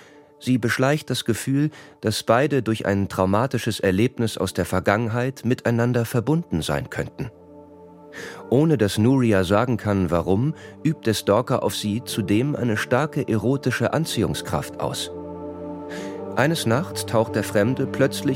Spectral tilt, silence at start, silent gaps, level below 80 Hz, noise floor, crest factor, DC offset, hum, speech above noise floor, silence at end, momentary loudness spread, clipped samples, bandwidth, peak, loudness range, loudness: -6 dB/octave; 0 s; none; -50 dBFS; -45 dBFS; 20 dB; under 0.1%; none; 23 dB; 0 s; 12 LU; under 0.1%; 16.5 kHz; -2 dBFS; 4 LU; -22 LUFS